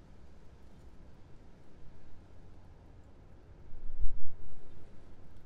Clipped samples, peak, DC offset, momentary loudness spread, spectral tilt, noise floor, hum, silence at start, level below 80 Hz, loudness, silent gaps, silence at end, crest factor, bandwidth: under 0.1%; -12 dBFS; under 0.1%; 14 LU; -8 dB/octave; -53 dBFS; none; 0.45 s; -44 dBFS; -54 LUFS; none; 0.05 s; 18 dB; 1.8 kHz